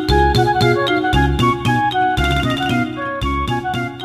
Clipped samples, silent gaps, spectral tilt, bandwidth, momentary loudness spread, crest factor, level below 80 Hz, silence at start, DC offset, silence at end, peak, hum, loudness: under 0.1%; none; -6 dB/octave; 15.5 kHz; 6 LU; 14 dB; -26 dBFS; 0 s; 0.2%; 0 s; -2 dBFS; none; -17 LUFS